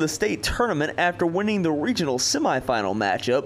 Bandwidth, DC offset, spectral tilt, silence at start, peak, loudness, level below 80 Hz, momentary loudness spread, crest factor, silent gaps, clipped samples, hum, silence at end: 15.5 kHz; under 0.1%; -4 dB/octave; 0 s; -8 dBFS; -23 LUFS; -44 dBFS; 2 LU; 14 dB; none; under 0.1%; none; 0 s